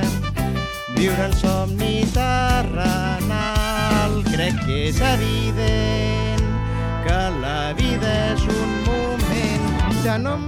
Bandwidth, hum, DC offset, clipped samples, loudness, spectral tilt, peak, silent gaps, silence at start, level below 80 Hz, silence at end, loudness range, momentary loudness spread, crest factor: 17.5 kHz; none; under 0.1%; under 0.1%; -21 LUFS; -5.5 dB/octave; -6 dBFS; none; 0 s; -26 dBFS; 0 s; 1 LU; 4 LU; 14 dB